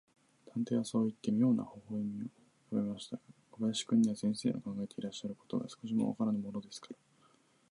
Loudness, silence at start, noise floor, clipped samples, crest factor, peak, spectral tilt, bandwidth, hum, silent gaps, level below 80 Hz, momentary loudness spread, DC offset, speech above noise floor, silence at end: -36 LUFS; 0.55 s; -69 dBFS; under 0.1%; 16 dB; -20 dBFS; -6 dB/octave; 11.5 kHz; none; none; -76 dBFS; 15 LU; under 0.1%; 34 dB; 0.75 s